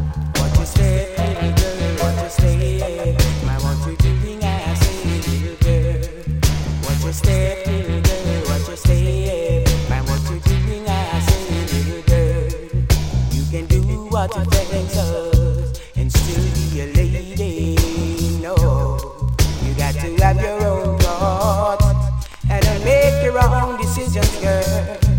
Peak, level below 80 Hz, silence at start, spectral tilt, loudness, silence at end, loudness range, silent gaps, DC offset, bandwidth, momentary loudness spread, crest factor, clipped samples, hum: 0 dBFS; -22 dBFS; 0 s; -6 dB/octave; -19 LUFS; 0 s; 3 LU; none; under 0.1%; 17 kHz; 5 LU; 16 dB; under 0.1%; none